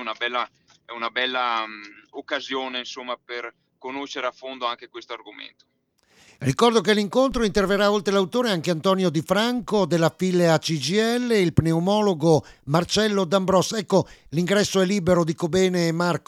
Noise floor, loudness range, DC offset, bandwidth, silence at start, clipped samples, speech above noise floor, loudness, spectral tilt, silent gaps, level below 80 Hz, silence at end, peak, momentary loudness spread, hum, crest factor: -62 dBFS; 10 LU; under 0.1%; 15.5 kHz; 0 s; under 0.1%; 40 dB; -22 LUFS; -5 dB/octave; none; -50 dBFS; 0.1 s; -2 dBFS; 14 LU; none; 20 dB